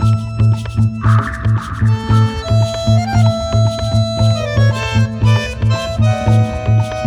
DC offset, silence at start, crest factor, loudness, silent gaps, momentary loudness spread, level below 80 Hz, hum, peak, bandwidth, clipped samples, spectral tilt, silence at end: under 0.1%; 0 s; 12 dB; -15 LUFS; none; 3 LU; -28 dBFS; none; -2 dBFS; 10 kHz; under 0.1%; -7 dB/octave; 0 s